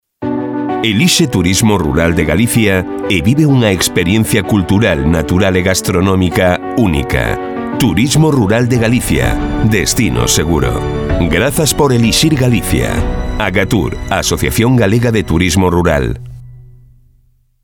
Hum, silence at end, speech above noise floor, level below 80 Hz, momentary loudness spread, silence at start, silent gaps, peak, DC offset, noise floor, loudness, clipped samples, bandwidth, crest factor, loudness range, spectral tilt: none; 1.05 s; 40 dB; -26 dBFS; 6 LU; 0.2 s; none; 0 dBFS; under 0.1%; -52 dBFS; -12 LUFS; under 0.1%; 20 kHz; 12 dB; 1 LU; -5 dB/octave